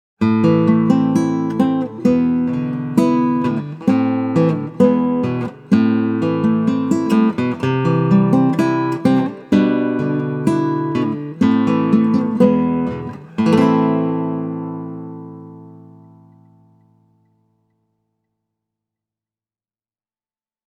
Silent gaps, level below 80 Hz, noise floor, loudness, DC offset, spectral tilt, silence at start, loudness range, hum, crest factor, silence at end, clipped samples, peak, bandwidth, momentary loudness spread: none; -56 dBFS; under -90 dBFS; -17 LUFS; under 0.1%; -8.5 dB/octave; 0.2 s; 4 LU; none; 16 dB; 4.9 s; under 0.1%; 0 dBFS; 10 kHz; 8 LU